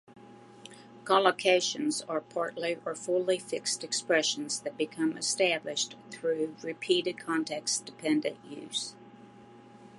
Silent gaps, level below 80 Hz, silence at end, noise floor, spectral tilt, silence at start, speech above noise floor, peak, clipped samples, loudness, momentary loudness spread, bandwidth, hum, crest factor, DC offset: none; -82 dBFS; 0 s; -53 dBFS; -2 dB/octave; 0.1 s; 22 dB; -8 dBFS; under 0.1%; -30 LUFS; 11 LU; 11.5 kHz; none; 24 dB; under 0.1%